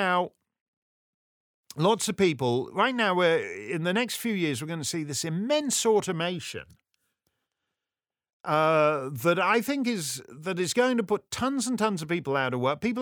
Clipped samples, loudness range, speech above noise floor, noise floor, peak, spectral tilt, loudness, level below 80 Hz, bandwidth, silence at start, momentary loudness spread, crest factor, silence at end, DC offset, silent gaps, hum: under 0.1%; 4 LU; over 64 dB; under -90 dBFS; -8 dBFS; -4 dB/octave; -26 LUFS; -68 dBFS; over 20 kHz; 0 s; 8 LU; 18 dB; 0 s; under 0.1%; 0.61-1.64 s, 8.33-8.44 s; none